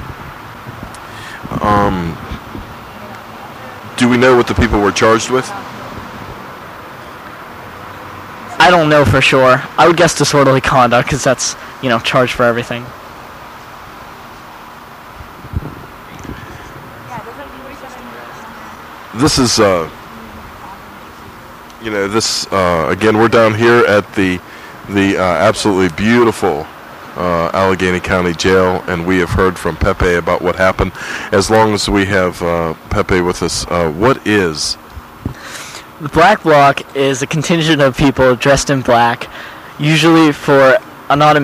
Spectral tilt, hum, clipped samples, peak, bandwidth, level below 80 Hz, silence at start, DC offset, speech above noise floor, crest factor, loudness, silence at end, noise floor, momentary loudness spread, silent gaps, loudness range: -4.5 dB/octave; none; under 0.1%; 0 dBFS; 15.5 kHz; -34 dBFS; 0 s; under 0.1%; 22 dB; 14 dB; -12 LUFS; 0 s; -34 dBFS; 22 LU; none; 17 LU